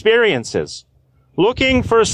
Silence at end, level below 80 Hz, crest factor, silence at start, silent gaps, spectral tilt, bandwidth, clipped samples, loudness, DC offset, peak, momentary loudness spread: 0 s; -38 dBFS; 12 dB; 0.05 s; none; -4 dB/octave; 10.5 kHz; under 0.1%; -16 LUFS; under 0.1%; -4 dBFS; 16 LU